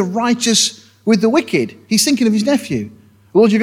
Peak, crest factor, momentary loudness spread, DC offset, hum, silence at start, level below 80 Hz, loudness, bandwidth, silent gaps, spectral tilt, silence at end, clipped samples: 0 dBFS; 14 dB; 10 LU; under 0.1%; none; 0 s; -60 dBFS; -15 LUFS; 16 kHz; none; -3.5 dB/octave; 0 s; under 0.1%